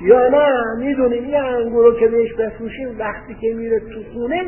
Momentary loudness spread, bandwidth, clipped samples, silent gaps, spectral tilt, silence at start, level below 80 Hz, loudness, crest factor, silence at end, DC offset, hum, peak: 13 LU; 3.2 kHz; under 0.1%; none; -10.5 dB/octave; 0 s; -44 dBFS; -17 LUFS; 16 dB; 0 s; under 0.1%; none; 0 dBFS